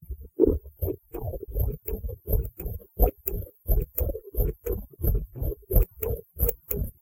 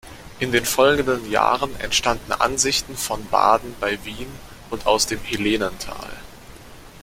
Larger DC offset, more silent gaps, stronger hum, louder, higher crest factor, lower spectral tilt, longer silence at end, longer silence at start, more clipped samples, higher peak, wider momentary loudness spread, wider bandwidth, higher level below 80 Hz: neither; neither; neither; second, -30 LUFS vs -20 LUFS; about the same, 22 dB vs 20 dB; first, -8.5 dB/octave vs -2.5 dB/octave; about the same, 0.1 s vs 0 s; about the same, 0 s vs 0.05 s; neither; second, -6 dBFS vs -2 dBFS; second, 11 LU vs 17 LU; about the same, 17 kHz vs 16.5 kHz; first, -30 dBFS vs -42 dBFS